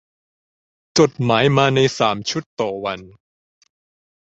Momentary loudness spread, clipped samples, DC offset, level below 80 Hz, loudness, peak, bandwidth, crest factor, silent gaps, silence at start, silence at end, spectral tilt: 11 LU; under 0.1%; under 0.1%; -56 dBFS; -18 LUFS; -2 dBFS; 8 kHz; 20 dB; 2.46-2.57 s; 0.95 s; 1.15 s; -5 dB/octave